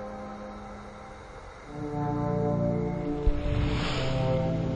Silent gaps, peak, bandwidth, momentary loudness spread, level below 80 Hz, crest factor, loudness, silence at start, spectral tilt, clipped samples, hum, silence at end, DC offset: none; -12 dBFS; 9.4 kHz; 17 LU; -36 dBFS; 18 dB; -30 LUFS; 0 s; -7.5 dB/octave; under 0.1%; none; 0 s; under 0.1%